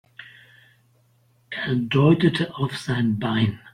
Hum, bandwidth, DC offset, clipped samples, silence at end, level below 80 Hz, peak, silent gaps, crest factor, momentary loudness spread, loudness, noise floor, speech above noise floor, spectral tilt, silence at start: none; 11.5 kHz; under 0.1%; under 0.1%; 0.05 s; -56 dBFS; -4 dBFS; none; 18 dB; 16 LU; -22 LUFS; -61 dBFS; 40 dB; -7 dB/octave; 0.2 s